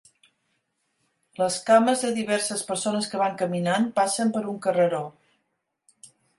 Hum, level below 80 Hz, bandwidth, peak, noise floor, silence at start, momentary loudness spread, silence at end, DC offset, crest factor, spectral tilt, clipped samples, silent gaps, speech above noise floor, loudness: none; -72 dBFS; 11.5 kHz; -4 dBFS; -77 dBFS; 1.4 s; 8 LU; 0.35 s; under 0.1%; 20 dB; -4 dB/octave; under 0.1%; none; 53 dB; -24 LUFS